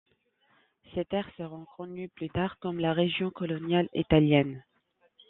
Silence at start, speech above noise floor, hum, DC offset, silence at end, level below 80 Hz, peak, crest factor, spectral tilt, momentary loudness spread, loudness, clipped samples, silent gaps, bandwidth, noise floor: 0.9 s; 42 dB; none; under 0.1%; 0.7 s; -54 dBFS; -10 dBFS; 22 dB; -5.5 dB/octave; 17 LU; -29 LUFS; under 0.1%; none; 4.1 kHz; -70 dBFS